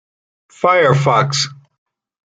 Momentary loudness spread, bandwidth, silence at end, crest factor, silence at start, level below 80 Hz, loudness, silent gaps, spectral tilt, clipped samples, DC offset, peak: 7 LU; 9.2 kHz; 0.75 s; 16 dB; 0.6 s; -58 dBFS; -14 LUFS; none; -4.5 dB/octave; under 0.1%; under 0.1%; 0 dBFS